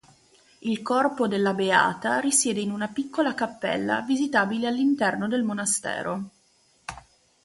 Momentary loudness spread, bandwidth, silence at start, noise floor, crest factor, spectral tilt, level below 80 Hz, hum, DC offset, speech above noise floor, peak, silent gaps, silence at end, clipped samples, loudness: 13 LU; 11.5 kHz; 0.65 s; -63 dBFS; 22 dB; -3.5 dB/octave; -64 dBFS; none; under 0.1%; 38 dB; -4 dBFS; none; 0.45 s; under 0.1%; -25 LUFS